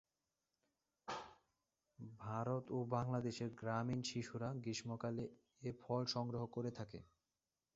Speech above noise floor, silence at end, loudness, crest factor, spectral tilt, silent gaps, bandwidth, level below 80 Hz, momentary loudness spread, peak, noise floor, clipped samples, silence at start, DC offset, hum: over 46 dB; 0.7 s; -45 LUFS; 20 dB; -6 dB/octave; none; 7.6 kHz; -74 dBFS; 12 LU; -26 dBFS; under -90 dBFS; under 0.1%; 1.05 s; under 0.1%; none